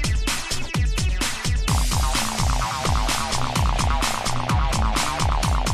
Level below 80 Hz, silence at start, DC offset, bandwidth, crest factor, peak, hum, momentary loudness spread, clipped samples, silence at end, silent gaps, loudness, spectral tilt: -24 dBFS; 0 s; under 0.1%; 14 kHz; 14 dB; -6 dBFS; none; 3 LU; under 0.1%; 0 s; none; -23 LUFS; -3.5 dB/octave